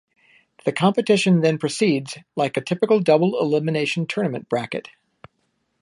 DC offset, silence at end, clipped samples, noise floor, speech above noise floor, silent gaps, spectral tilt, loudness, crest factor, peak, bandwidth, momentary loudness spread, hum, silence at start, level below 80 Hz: under 0.1%; 1 s; under 0.1%; -71 dBFS; 50 dB; none; -6 dB/octave; -21 LUFS; 18 dB; -2 dBFS; 11.5 kHz; 9 LU; none; 0.65 s; -68 dBFS